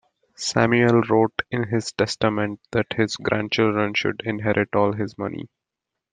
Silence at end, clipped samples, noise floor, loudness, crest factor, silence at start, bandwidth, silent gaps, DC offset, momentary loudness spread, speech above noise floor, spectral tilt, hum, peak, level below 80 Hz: 0.65 s; under 0.1%; -84 dBFS; -22 LUFS; 20 dB; 0.4 s; 9.6 kHz; none; under 0.1%; 10 LU; 63 dB; -5.5 dB/octave; none; -2 dBFS; -58 dBFS